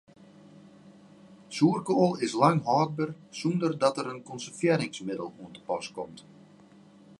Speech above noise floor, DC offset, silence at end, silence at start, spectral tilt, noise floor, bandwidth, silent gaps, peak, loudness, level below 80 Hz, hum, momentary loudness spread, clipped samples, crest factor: 27 dB; under 0.1%; 1 s; 0.85 s; -6 dB/octave; -55 dBFS; 11.5 kHz; none; -6 dBFS; -28 LUFS; -74 dBFS; none; 15 LU; under 0.1%; 24 dB